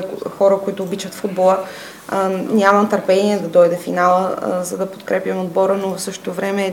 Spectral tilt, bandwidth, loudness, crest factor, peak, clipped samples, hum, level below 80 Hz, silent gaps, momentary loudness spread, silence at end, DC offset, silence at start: -5.5 dB/octave; 17 kHz; -17 LUFS; 18 dB; 0 dBFS; under 0.1%; none; -66 dBFS; none; 11 LU; 0 s; under 0.1%; 0 s